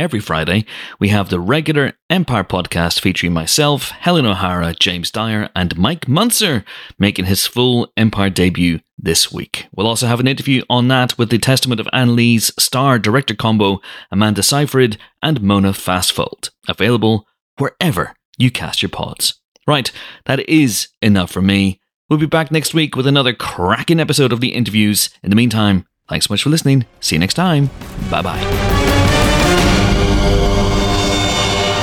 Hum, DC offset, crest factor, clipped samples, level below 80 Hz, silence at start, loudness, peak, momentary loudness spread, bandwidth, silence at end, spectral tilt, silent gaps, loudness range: none; under 0.1%; 14 dB; under 0.1%; -28 dBFS; 0 s; -15 LUFS; 0 dBFS; 7 LU; 19 kHz; 0 s; -4.5 dB/octave; 2.02-2.09 s, 8.93-8.97 s, 17.41-17.57 s, 18.25-18.33 s, 19.44-19.55 s, 20.97-21.01 s, 21.94-22.09 s; 3 LU